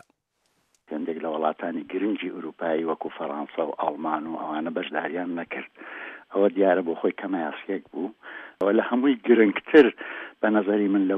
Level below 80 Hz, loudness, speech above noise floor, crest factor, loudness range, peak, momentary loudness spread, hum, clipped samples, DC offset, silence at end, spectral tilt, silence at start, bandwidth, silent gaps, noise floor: -76 dBFS; -25 LUFS; 48 dB; 20 dB; 8 LU; -4 dBFS; 15 LU; none; under 0.1%; under 0.1%; 0 s; -8 dB/octave; 0.9 s; 4.8 kHz; none; -72 dBFS